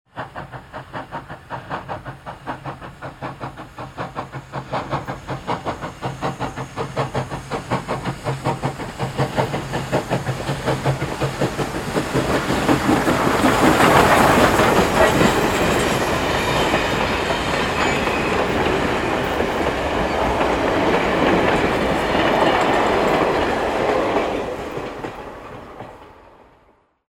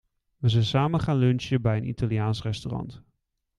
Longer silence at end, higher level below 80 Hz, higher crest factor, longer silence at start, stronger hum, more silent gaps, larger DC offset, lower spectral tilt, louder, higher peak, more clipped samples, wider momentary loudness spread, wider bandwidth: first, 1 s vs 0.6 s; first, -38 dBFS vs -50 dBFS; about the same, 20 dB vs 18 dB; second, 0.15 s vs 0.4 s; neither; neither; neither; second, -5 dB/octave vs -7.5 dB/octave; first, -19 LUFS vs -26 LUFS; first, 0 dBFS vs -8 dBFS; neither; first, 18 LU vs 10 LU; first, 17.5 kHz vs 10.5 kHz